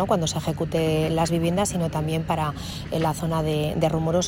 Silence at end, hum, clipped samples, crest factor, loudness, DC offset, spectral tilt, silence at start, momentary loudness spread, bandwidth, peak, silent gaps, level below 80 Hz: 0 s; none; under 0.1%; 16 dB; -24 LUFS; under 0.1%; -5.5 dB/octave; 0 s; 4 LU; 16 kHz; -8 dBFS; none; -44 dBFS